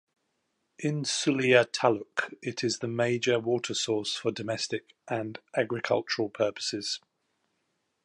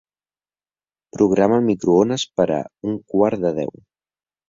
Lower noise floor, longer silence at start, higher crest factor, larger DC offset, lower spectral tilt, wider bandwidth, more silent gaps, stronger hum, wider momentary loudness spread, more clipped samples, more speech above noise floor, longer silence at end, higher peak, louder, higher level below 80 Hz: second, -78 dBFS vs under -90 dBFS; second, 0.8 s vs 1.15 s; about the same, 22 dB vs 18 dB; neither; second, -4 dB/octave vs -6 dB/octave; first, 11.5 kHz vs 7.8 kHz; neither; second, none vs 50 Hz at -45 dBFS; about the same, 11 LU vs 11 LU; neither; second, 49 dB vs over 72 dB; first, 1.05 s vs 0.8 s; second, -6 dBFS vs -2 dBFS; second, -29 LUFS vs -19 LUFS; second, -74 dBFS vs -56 dBFS